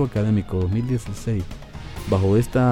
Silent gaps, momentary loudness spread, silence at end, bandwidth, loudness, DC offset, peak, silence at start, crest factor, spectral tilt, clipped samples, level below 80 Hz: none; 16 LU; 0 s; 16 kHz; -22 LUFS; under 0.1%; -8 dBFS; 0 s; 14 dB; -8 dB/octave; under 0.1%; -38 dBFS